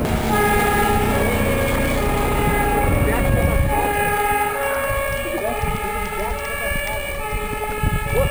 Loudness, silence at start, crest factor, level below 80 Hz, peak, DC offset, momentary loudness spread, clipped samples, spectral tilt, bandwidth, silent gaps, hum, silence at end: -20 LUFS; 0 s; 12 dB; -26 dBFS; -6 dBFS; 0.2%; 7 LU; under 0.1%; -5 dB/octave; over 20 kHz; none; none; 0 s